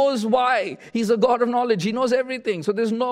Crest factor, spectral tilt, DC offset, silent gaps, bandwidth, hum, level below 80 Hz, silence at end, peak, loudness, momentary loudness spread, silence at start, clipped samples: 14 dB; -5.5 dB/octave; under 0.1%; none; 14.5 kHz; none; -68 dBFS; 0 s; -6 dBFS; -21 LUFS; 6 LU; 0 s; under 0.1%